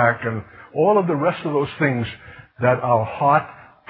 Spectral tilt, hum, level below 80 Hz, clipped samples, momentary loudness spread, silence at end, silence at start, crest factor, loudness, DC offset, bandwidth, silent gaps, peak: -12 dB/octave; none; -52 dBFS; under 0.1%; 13 LU; 0.3 s; 0 s; 18 dB; -20 LUFS; under 0.1%; 4.8 kHz; none; -2 dBFS